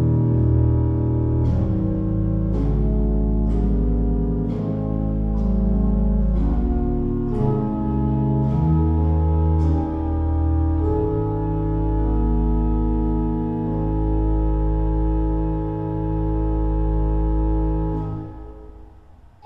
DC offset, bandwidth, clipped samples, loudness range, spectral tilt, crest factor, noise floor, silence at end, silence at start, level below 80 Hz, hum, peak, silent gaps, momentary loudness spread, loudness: under 0.1%; 3.4 kHz; under 0.1%; 2 LU; -12 dB/octave; 12 dB; -46 dBFS; 0.35 s; 0 s; -24 dBFS; none; -8 dBFS; none; 5 LU; -22 LUFS